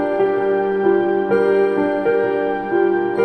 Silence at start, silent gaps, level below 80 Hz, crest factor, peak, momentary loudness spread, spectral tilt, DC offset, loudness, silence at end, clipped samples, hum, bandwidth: 0 s; none; -54 dBFS; 12 dB; -4 dBFS; 2 LU; -8 dB/octave; under 0.1%; -17 LUFS; 0 s; under 0.1%; none; 5 kHz